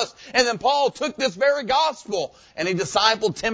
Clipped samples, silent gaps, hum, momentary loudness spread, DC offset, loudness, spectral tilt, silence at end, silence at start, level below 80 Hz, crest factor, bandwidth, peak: under 0.1%; none; none; 9 LU; under 0.1%; -21 LUFS; -3 dB/octave; 0 s; 0 s; -56 dBFS; 18 dB; 8 kHz; -4 dBFS